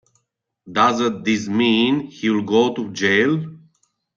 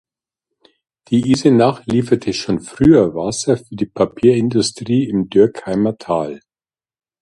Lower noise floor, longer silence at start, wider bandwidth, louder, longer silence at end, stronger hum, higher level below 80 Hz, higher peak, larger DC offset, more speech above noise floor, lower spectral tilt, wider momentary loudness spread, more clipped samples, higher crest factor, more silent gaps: second, -72 dBFS vs under -90 dBFS; second, 0.65 s vs 1.1 s; second, 7.6 kHz vs 11.5 kHz; second, -19 LUFS vs -16 LUFS; second, 0.6 s vs 0.85 s; neither; second, -64 dBFS vs -46 dBFS; second, -4 dBFS vs 0 dBFS; neither; second, 54 dB vs over 75 dB; about the same, -5 dB/octave vs -6 dB/octave; second, 5 LU vs 9 LU; neither; about the same, 16 dB vs 16 dB; neither